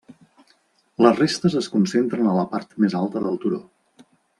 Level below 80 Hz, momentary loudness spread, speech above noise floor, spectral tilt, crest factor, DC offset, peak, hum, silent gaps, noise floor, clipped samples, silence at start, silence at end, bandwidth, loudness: -64 dBFS; 10 LU; 42 dB; -6 dB/octave; 20 dB; under 0.1%; -2 dBFS; none; none; -62 dBFS; under 0.1%; 0.1 s; 0.8 s; 11.5 kHz; -21 LUFS